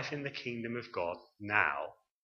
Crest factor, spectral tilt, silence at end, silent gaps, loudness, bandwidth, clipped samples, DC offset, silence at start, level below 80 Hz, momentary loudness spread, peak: 26 dB; -5.5 dB/octave; 0.3 s; none; -35 LUFS; 7.2 kHz; under 0.1%; under 0.1%; 0 s; -74 dBFS; 12 LU; -12 dBFS